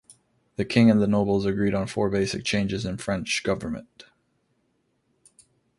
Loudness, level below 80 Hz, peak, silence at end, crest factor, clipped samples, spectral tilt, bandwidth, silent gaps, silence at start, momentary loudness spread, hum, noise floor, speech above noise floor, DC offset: -24 LUFS; -50 dBFS; -6 dBFS; 1.75 s; 20 dB; under 0.1%; -5.5 dB/octave; 11.5 kHz; none; 0.1 s; 12 LU; none; -71 dBFS; 47 dB; under 0.1%